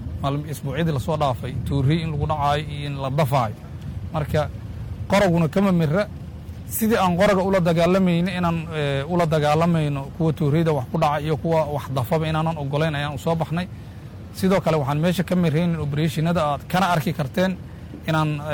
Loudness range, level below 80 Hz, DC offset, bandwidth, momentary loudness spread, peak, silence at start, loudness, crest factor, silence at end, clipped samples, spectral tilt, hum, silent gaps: 4 LU; -42 dBFS; under 0.1%; 18 kHz; 11 LU; -6 dBFS; 0 s; -22 LUFS; 16 dB; 0 s; under 0.1%; -7 dB/octave; none; none